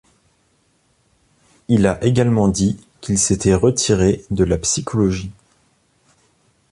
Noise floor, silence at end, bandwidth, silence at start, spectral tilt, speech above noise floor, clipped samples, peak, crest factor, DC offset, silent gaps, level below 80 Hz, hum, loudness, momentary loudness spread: -61 dBFS; 1.4 s; 11.5 kHz; 1.7 s; -5.5 dB/octave; 45 dB; under 0.1%; -2 dBFS; 16 dB; under 0.1%; none; -38 dBFS; none; -17 LUFS; 6 LU